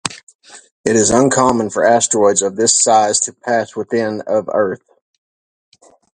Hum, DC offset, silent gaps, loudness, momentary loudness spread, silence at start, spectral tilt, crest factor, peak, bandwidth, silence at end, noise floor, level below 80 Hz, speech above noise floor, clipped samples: none; under 0.1%; 0.23-0.27 s, 0.35-0.39 s, 0.71-0.84 s; -14 LUFS; 8 LU; 0.05 s; -3 dB/octave; 16 dB; 0 dBFS; 11.5 kHz; 1.4 s; under -90 dBFS; -50 dBFS; over 76 dB; under 0.1%